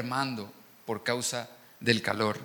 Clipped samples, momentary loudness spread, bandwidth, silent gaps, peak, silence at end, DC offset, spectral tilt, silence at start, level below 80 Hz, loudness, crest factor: under 0.1%; 19 LU; 19 kHz; none; -8 dBFS; 0 s; under 0.1%; -3.5 dB/octave; 0 s; -74 dBFS; -31 LUFS; 24 dB